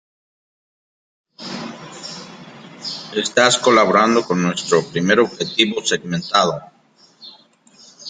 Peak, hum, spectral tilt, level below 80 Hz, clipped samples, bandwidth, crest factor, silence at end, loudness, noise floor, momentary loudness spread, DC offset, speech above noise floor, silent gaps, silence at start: 0 dBFS; none; -3.5 dB/octave; -62 dBFS; under 0.1%; 9.6 kHz; 20 dB; 0 s; -17 LUFS; -53 dBFS; 19 LU; under 0.1%; 37 dB; none; 1.4 s